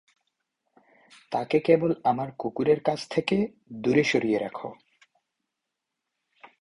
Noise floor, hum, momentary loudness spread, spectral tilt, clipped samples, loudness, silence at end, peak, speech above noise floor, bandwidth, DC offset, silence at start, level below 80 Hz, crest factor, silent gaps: -84 dBFS; none; 11 LU; -6 dB/octave; under 0.1%; -26 LUFS; 0.15 s; -8 dBFS; 59 dB; 11 kHz; under 0.1%; 1.3 s; -64 dBFS; 20 dB; none